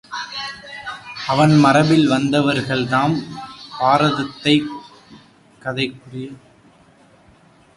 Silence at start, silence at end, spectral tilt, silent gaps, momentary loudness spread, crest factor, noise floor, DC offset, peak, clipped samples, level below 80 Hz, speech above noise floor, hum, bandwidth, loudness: 0.1 s; 1.4 s; -6 dB/octave; none; 20 LU; 18 dB; -51 dBFS; under 0.1%; 0 dBFS; under 0.1%; -54 dBFS; 34 dB; none; 11.5 kHz; -17 LUFS